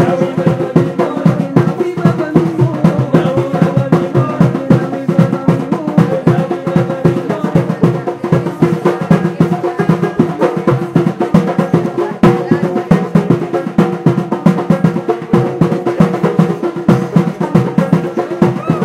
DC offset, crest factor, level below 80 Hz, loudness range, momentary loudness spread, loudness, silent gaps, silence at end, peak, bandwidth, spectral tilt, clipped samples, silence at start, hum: under 0.1%; 12 dB; -44 dBFS; 1 LU; 3 LU; -13 LUFS; none; 0 s; 0 dBFS; 10.5 kHz; -8.5 dB/octave; 0.2%; 0 s; none